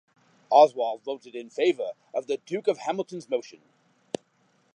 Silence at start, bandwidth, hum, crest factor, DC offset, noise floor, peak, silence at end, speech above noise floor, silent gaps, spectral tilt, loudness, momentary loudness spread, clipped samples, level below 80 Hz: 0.5 s; 10 kHz; none; 22 dB; under 0.1%; -67 dBFS; -4 dBFS; 1.3 s; 41 dB; none; -5 dB/octave; -26 LUFS; 19 LU; under 0.1%; -86 dBFS